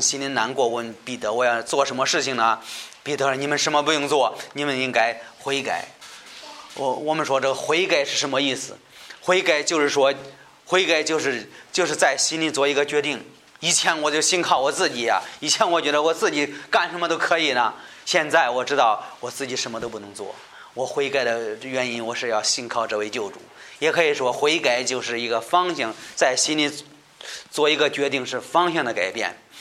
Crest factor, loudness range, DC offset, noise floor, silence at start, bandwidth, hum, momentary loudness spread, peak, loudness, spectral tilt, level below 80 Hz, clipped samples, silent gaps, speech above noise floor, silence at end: 20 dB; 4 LU; under 0.1%; -42 dBFS; 0 s; 15 kHz; none; 13 LU; -2 dBFS; -22 LUFS; -2 dB/octave; -70 dBFS; under 0.1%; none; 20 dB; 0 s